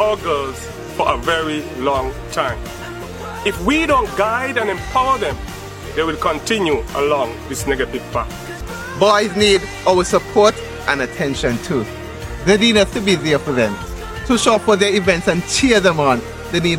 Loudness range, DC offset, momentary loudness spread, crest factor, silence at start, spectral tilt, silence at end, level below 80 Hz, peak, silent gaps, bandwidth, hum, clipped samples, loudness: 5 LU; under 0.1%; 14 LU; 18 dB; 0 s; -4 dB/octave; 0 s; -34 dBFS; 0 dBFS; none; 16.5 kHz; none; under 0.1%; -17 LUFS